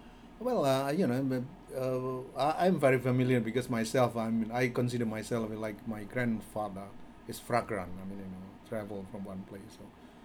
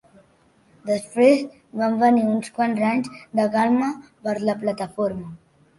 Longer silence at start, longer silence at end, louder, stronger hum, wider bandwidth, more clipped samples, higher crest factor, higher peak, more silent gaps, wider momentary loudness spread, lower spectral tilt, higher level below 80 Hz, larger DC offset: second, 0 s vs 0.85 s; second, 0 s vs 0.4 s; second, -32 LUFS vs -22 LUFS; neither; first, 19.5 kHz vs 11.5 kHz; neither; about the same, 20 dB vs 18 dB; second, -14 dBFS vs -4 dBFS; neither; first, 17 LU vs 12 LU; about the same, -6.5 dB/octave vs -6 dB/octave; about the same, -60 dBFS vs -62 dBFS; neither